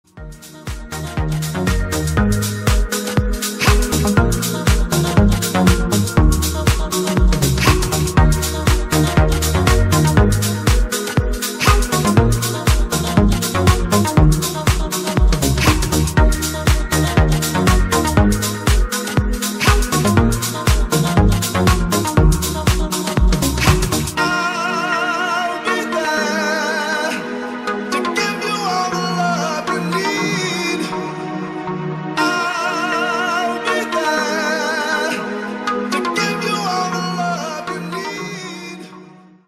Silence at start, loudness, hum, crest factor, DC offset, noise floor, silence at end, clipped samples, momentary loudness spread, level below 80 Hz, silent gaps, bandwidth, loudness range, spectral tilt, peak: 0.15 s; -17 LUFS; none; 16 dB; under 0.1%; -42 dBFS; 0.35 s; under 0.1%; 8 LU; -22 dBFS; none; 16 kHz; 4 LU; -4.5 dB/octave; 0 dBFS